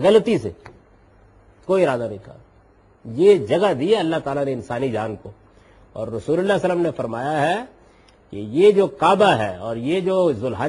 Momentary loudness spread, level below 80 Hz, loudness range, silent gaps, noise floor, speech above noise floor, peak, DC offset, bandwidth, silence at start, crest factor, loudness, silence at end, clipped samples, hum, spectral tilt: 17 LU; -54 dBFS; 5 LU; none; -53 dBFS; 34 dB; -4 dBFS; under 0.1%; 11.5 kHz; 0 s; 18 dB; -19 LUFS; 0 s; under 0.1%; none; -6.5 dB/octave